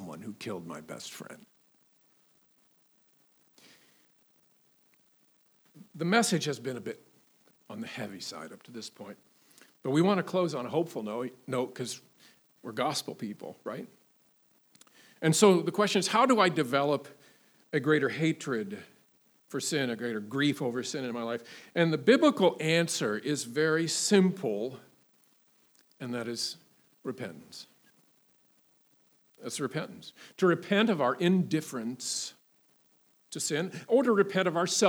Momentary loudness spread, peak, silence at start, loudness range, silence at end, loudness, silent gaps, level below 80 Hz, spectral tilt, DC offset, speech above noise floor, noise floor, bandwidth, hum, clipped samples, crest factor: 19 LU; -6 dBFS; 0 s; 14 LU; 0 s; -29 LUFS; none; -88 dBFS; -4.5 dB/octave; under 0.1%; 38 dB; -67 dBFS; over 20 kHz; none; under 0.1%; 24 dB